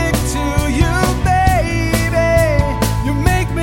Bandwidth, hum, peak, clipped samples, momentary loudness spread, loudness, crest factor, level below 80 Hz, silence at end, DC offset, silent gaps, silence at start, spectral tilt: 17 kHz; none; 0 dBFS; under 0.1%; 4 LU; -15 LUFS; 14 dB; -20 dBFS; 0 s; under 0.1%; none; 0 s; -5.5 dB/octave